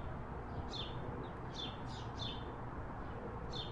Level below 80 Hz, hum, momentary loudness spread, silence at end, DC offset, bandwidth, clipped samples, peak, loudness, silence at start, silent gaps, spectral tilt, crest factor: -52 dBFS; none; 3 LU; 0 s; under 0.1%; 11 kHz; under 0.1%; -30 dBFS; -45 LUFS; 0 s; none; -6 dB/octave; 14 dB